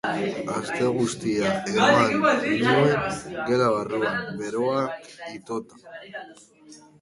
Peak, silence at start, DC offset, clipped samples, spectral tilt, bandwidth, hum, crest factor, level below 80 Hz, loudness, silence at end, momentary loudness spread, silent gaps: -4 dBFS; 0.05 s; under 0.1%; under 0.1%; -5 dB/octave; 11.5 kHz; none; 20 dB; -58 dBFS; -23 LUFS; 0.25 s; 19 LU; none